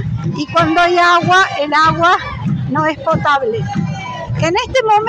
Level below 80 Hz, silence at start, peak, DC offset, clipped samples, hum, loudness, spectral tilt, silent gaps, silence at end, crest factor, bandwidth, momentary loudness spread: -40 dBFS; 0 s; -2 dBFS; under 0.1%; under 0.1%; none; -14 LUFS; -5.5 dB/octave; none; 0 s; 12 dB; 11 kHz; 10 LU